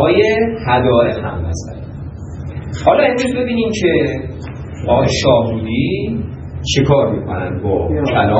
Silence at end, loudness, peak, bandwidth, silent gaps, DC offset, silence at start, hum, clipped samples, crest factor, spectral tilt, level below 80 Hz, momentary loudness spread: 0 s; -15 LUFS; 0 dBFS; 9.6 kHz; none; under 0.1%; 0 s; none; under 0.1%; 16 dB; -6 dB/octave; -36 dBFS; 15 LU